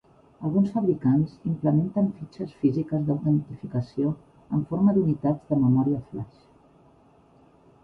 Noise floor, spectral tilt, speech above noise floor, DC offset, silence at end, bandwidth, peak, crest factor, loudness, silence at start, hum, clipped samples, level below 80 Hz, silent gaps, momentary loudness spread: -57 dBFS; -11.5 dB/octave; 33 dB; under 0.1%; 1.6 s; 5.4 kHz; -10 dBFS; 16 dB; -25 LUFS; 0.4 s; none; under 0.1%; -58 dBFS; none; 12 LU